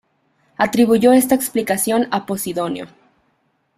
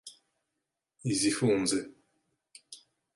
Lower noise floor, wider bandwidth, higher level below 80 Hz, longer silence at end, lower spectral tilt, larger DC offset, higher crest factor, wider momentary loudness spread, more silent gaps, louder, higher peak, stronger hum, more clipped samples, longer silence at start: second, -65 dBFS vs -86 dBFS; first, 16 kHz vs 11.5 kHz; first, -58 dBFS vs -68 dBFS; first, 0.9 s vs 0.4 s; about the same, -4.5 dB/octave vs -4 dB/octave; neither; about the same, 16 dB vs 20 dB; second, 12 LU vs 24 LU; neither; first, -17 LUFS vs -29 LUFS; first, -2 dBFS vs -14 dBFS; neither; neither; first, 0.6 s vs 0.05 s